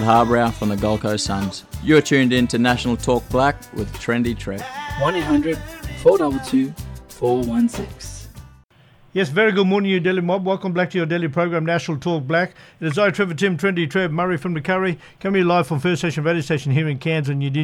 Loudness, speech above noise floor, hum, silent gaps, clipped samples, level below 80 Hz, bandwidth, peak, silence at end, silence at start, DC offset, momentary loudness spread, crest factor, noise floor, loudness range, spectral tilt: -20 LUFS; 32 dB; none; none; under 0.1%; -42 dBFS; 19 kHz; -2 dBFS; 0 s; 0 s; under 0.1%; 11 LU; 16 dB; -51 dBFS; 3 LU; -6 dB/octave